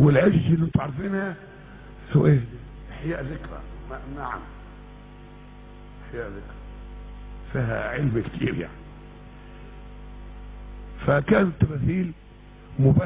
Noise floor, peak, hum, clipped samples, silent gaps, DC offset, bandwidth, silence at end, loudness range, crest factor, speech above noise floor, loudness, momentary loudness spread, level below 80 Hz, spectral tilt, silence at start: -45 dBFS; -6 dBFS; 50 Hz at -40 dBFS; under 0.1%; none; under 0.1%; 3.9 kHz; 0 s; 13 LU; 18 dB; 22 dB; -25 LUFS; 25 LU; -40 dBFS; -12 dB/octave; 0 s